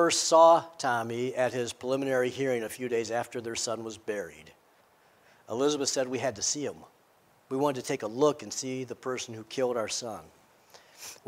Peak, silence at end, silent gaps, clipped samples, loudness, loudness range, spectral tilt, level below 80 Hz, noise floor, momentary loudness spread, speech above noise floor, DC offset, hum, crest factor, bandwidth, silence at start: -8 dBFS; 0.15 s; none; under 0.1%; -29 LUFS; 6 LU; -3 dB/octave; -74 dBFS; -64 dBFS; 13 LU; 35 dB; under 0.1%; none; 22 dB; 16 kHz; 0 s